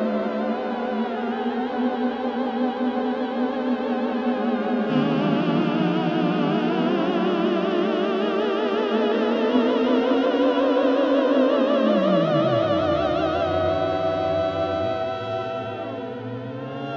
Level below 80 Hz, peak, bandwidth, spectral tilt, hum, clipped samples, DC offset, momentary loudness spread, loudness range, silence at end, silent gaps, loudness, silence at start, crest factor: -56 dBFS; -6 dBFS; 6.8 kHz; -7.5 dB/octave; none; under 0.1%; under 0.1%; 7 LU; 5 LU; 0 s; none; -23 LUFS; 0 s; 16 dB